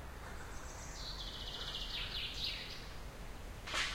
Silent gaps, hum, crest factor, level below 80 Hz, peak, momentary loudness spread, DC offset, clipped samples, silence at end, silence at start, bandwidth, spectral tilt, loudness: none; none; 18 dB; -50 dBFS; -24 dBFS; 11 LU; under 0.1%; under 0.1%; 0 s; 0 s; 16 kHz; -2 dB/octave; -43 LUFS